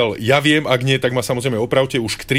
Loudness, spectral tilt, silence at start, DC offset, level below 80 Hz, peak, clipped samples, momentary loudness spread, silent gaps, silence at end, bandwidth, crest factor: -17 LUFS; -5 dB/octave; 0 s; 0.3%; -48 dBFS; -2 dBFS; under 0.1%; 6 LU; none; 0 s; 16 kHz; 16 dB